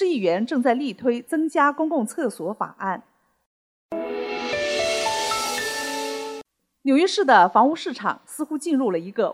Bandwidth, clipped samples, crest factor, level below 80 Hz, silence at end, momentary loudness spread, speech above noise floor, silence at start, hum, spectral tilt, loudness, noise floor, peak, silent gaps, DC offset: 16.5 kHz; under 0.1%; 20 dB; -64 dBFS; 0 s; 12 LU; 21 dB; 0 s; none; -3.5 dB/octave; -22 LUFS; -43 dBFS; -4 dBFS; 3.46-3.89 s; under 0.1%